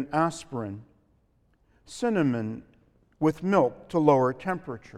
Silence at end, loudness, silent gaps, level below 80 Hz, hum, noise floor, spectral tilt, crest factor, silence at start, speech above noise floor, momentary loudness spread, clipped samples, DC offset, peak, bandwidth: 0 s; -26 LUFS; none; -62 dBFS; none; -66 dBFS; -7 dB/octave; 20 dB; 0 s; 40 dB; 15 LU; under 0.1%; under 0.1%; -6 dBFS; 12.5 kHz